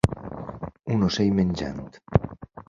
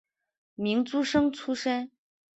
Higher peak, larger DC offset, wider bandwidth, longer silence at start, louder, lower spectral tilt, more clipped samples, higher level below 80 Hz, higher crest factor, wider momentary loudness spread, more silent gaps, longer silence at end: first, -2 dBFS vs -12 dBFS; neither; first, 11 kHz vs 8.2 kHz; second, 0.05 s vs 0.6 s; first, -25 LUFS vs -28 LUFS; first, -7 dB/octave vs -4.5 dB/octave; neither; first, -40 dBFS vs -64 dBFS; first, 24 dB vs 18 dB; first, 15 LU vs 8 LU; neither; second, 0.05 s vs 0.5 s